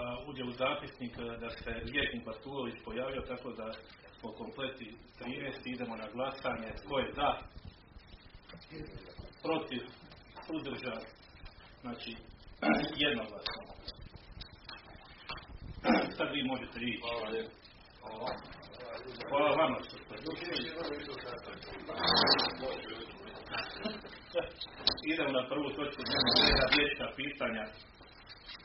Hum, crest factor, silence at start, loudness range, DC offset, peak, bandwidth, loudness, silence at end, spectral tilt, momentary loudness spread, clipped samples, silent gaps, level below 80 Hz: none; 26 dB; 0 s; 12 LU; under 0.1%; -12 dBFS; 5.8 kHz; -35 LUFS; 0 s; -1.5 dB/octave; 22 LU; under 0.1%; none; -54 dBFS